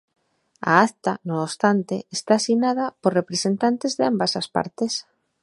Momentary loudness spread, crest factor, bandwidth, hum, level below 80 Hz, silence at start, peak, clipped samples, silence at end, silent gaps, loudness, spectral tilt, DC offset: 9 LU; 22 dB; 11.5 kHz; none; -68 dBFS; 0.6 s; 0 dBFS; under 0.1%; 0.4 s; none; -22 LUFS; -4.5 dB/octave; under 0.1%